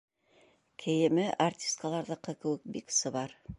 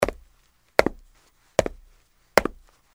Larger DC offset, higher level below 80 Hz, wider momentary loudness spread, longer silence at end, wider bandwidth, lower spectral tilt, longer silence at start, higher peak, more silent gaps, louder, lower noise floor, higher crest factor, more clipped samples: neither; second, -64 dBFS vs -44 dBFS; about the same, 10 LU vs 10 LU; second, 0.05 s vs 0.45 s; second, 11.5 kHz vs 16 kHz; about the same, -4 dB/octave vs -4 dB/octave; first, 0.8 s vs 0 s; second, -16 dBFS vs 0 dBFS; neither; second, -32 LUFS vs -25 LUFS; first, -66 dBFS vs -62 dBFS; second, 18 dB vs 28 dB; neither